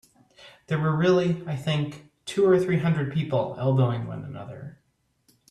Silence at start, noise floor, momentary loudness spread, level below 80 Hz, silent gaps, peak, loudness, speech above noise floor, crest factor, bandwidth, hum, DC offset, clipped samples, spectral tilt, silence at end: 0.4 s; -67 dBFS; 17 LU; -60 dBFS; none; -8 dBFS; -25 LUFS; 43 dB; 16 dB; 11.5 kHz; none; under 0.1%; under 0.1%; -7.5 dB/octave; 0.8 s